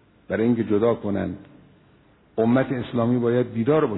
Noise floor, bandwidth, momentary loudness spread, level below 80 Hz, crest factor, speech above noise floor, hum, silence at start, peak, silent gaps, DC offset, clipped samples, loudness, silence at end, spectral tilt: -56 dBFS; 4.1 kHz; 9 LU; -58 dBFS; 14 dB; 35 dB; none; 0.3 s; -8 dBFS; none; under 0.1%; under 0.1%; -23 LUFS; 0 s; -12 dB/octave